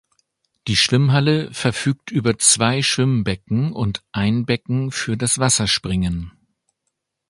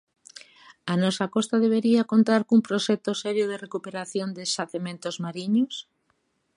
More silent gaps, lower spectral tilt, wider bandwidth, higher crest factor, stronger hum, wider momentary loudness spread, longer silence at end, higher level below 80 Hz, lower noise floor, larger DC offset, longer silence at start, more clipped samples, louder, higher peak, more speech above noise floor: neither; about the same, -4 dB/octave vs -5 dB/octave; about the same, 11.5 kHz vs 11 kHz; about the same, 20 dB vs 18 dB; neither; second, 8 LU vs 12 LU; first, 1 s vs 0.75 s; first, -42 dBFS vs -76 dBFS; first, -76 dBFS vs -71 dBFS; neither; second, 0.65 s vs 0.85 s; neither; first, -18 LUFS vs -25 LUFS; first, 0 dBFS vs -8 dBFS; first, 57 dB vs 47 dB